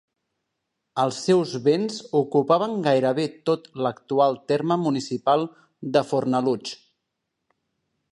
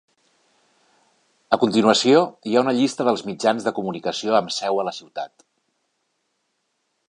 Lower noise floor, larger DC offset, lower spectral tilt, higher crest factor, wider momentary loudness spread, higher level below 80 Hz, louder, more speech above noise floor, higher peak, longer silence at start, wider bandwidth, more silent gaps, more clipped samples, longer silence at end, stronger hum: first, -80 dBFS vs -73 dBFS; neither; first, -6 dB/octave vs -4.5 dB/octave; about the same, 18 dB vs 22 dB; second, 8 LU vs 12 LU; about the same, -72 dBFS vs -70 dBFS; second, -23 LUFS vs -20 LUFS; first, 58 dB vs 53 dB; second, -6 dBFS vs 0 dBFS; second, 0.95 s vs 1.5 s; about the same, 11 kHz vs 11 kHz; neither; neither; second, 1.35 s vs 1.8 s; neither